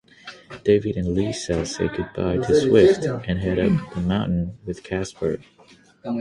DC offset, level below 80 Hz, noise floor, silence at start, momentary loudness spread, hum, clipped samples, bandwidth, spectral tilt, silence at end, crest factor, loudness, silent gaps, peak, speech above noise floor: under 0.1%; -42 dBFS; -52 dBFS; 0.25 s; 15 LU; none; under 0.1%; 11.5 kHz; -6.5 dB/octave; 0 s; 20 dB; -22 LUFS; none; -2 dBFS; 31 dB